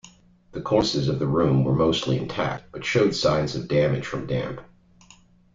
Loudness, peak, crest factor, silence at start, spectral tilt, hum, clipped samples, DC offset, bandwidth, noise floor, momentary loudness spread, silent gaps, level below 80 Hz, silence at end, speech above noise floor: -23 LUFS; -6 dBFS; 18 dB; 0.05 s; -6 dB/octave; none; under 0.1%; under 0.1%; 7.8 kHz; -54 dBFS; 9 LU; none; -48 dBFS; 0.9 s; 31 dB